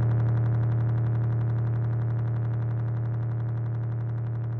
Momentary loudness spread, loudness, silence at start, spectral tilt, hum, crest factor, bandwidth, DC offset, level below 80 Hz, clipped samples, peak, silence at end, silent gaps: 5 LU; -27 LUFS; 0 s; -11.5 dB/octave; none; 10 dB; 2.3 kHz; under 0.1%; -48 dBFS; under 0.1%; -16 dBFS; 0 s; none